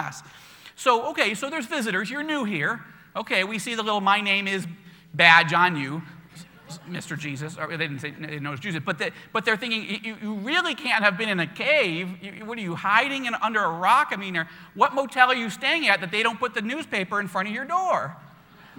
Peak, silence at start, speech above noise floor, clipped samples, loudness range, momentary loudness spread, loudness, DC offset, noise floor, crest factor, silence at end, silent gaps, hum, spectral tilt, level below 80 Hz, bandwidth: 0 dBFS; 0 s; 26 dB; under 0.1%; 7 LU; 14 LU; -23 LUFS; under 0.1%; -50 dBFS; 24 dB; 0.1 s; none; none; -4 dB/octave; -70 dBFS; 19 kHz